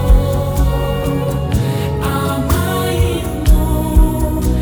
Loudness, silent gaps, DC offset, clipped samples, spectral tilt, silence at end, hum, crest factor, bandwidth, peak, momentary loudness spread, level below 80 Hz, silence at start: -16 LUFS; none; under 0.1%; under 0.1%; -6.5 dB/octave; 0 s; none; 14 dB; over 20 kHz; 0 dBFS; 3 LU; -16 dBFS; 0 s